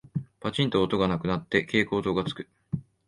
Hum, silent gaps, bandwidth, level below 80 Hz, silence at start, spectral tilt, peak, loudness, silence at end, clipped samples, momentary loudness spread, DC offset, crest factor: none; none; 11.5 kHz; -52 dBFS; 0.15 s; -6.5 dB/octave; -8 dBFS; -27 LUFS; 0.25 s; under 0.1%; 12 LU; under 0.1%; 20 dB